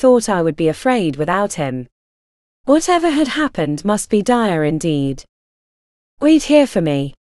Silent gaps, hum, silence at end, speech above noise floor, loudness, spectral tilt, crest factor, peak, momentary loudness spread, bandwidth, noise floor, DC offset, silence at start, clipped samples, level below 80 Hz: 1.92-2.64 s, 5.29-6.17 s; none; 0.1 s; over 75 dB; -16 LUFS; -5.5 dB/octave; 16 dB; 0 dBFS; 8 LU; 12.5 kHz; under -90 dBFS; under 0.1%; 0 s; under 0.1%; -44 dBFS